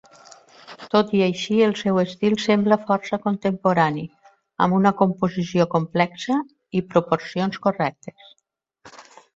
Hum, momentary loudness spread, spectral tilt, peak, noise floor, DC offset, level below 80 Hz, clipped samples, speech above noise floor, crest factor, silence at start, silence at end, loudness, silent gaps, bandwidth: none; 9 LU; -6.5 dB/octave; -2 dBFS; -52 dBFS; under 0.1%; -62 dBFS; under 0.1%; 31 dB; 20 dB; 0.7 s; 0.35 s; -21 LUFS; none; 7.8 kHz